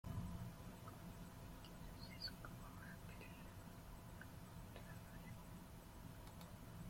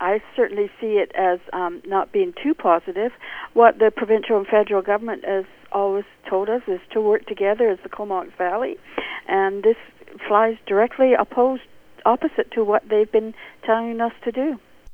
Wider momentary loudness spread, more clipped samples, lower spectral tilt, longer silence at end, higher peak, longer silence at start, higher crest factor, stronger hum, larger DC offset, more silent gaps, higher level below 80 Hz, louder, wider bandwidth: second, 7 LU vs 10 LU; neither; second, -5 dB/octave vs -7 dB/octave; about the same, 0 s vs 0 s; second, -38 dBFS vs 0 dBFS; about the same, 0.05 s vs 0 s; about the same, 18 dB vs 20 dB; neither; neither; neither; about the same, -62 dBFS vs -58 dBFS; second, -56 LUFS vs -21 LUFS; first, 16.5 kHz vs 4.5 kHz